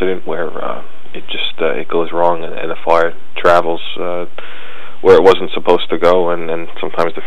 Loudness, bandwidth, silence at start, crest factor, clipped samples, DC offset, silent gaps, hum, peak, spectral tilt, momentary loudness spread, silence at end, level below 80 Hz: -15 LUFS; 10 kHz; 0 s; 16 dB; 0.3%; 20%; none; none; 0 dBFS; -5.5 dB/octave; 18 LU; 0 s; -48 dBFS